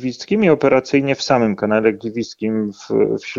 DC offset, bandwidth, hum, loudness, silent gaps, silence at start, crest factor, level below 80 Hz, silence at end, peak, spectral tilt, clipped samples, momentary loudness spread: under 0.1%; 7.6 kHz; none; -17 LUFS; none; 0 s; 16 dB; -54 dBFS; 0 s; -2 dBFS; -6 dB/octave; under 0.1%; 9 LU